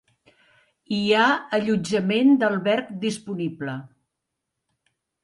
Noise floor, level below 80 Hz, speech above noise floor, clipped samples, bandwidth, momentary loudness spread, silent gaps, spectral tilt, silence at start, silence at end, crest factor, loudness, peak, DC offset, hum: -82 dBFS; -66 dBFS; 60 dB; under 0.1%; 11.5 kHz; 12 LU; none; -5.5 dB/octave; 0.9 s; 1.4 s; 18 dB; -22 LUFS; -6 dBFS; under 0.1%; none